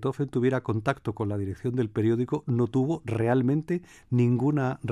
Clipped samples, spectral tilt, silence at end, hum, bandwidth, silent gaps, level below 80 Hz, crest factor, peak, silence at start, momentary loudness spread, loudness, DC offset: under 0.1%; -9 dB/octave; 0 s; none; 10.5 kHz; none; -58 dBFS; 16 dB; -10 dBFS; 0 s; 7 LU; -27 LUFS; under 0.1%